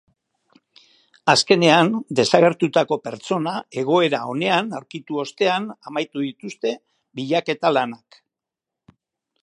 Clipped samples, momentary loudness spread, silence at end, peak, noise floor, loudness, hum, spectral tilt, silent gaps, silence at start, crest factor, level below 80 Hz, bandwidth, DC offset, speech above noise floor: under 0.1%; 14 LU; 1.45 s; 0 dBFS; -86 dBFS; -20 LUFS; none; -4.5 dB/octave; none; 1.25 s; 22 dB; -68 dBFS; 11.5 kHz; under 0.1%; 66 dB